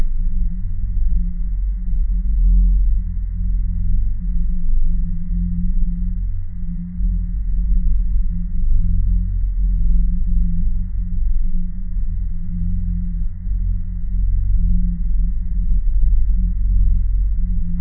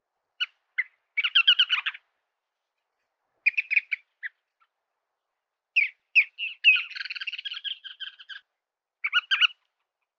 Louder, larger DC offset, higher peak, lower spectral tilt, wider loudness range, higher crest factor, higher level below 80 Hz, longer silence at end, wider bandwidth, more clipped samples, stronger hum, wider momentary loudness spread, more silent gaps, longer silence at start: about the same, -23 LUFS vs -24 LUFS; neither; first, -4 dBFS vs -8 dBFS; first, -14.5 dB/octave vs 7 dB/octave; second, 3 LU vs 6 LU; second, 12 dB vs 20 dB; first, -16 dBFS vs under -90 dBFS; second, 0 s vs 0.65 s; second, 0.3 kHz vs 7.2 kHz; neither; neither; second, 6 LU vs 20 LU; neither; second, 0 s vs 0.4 s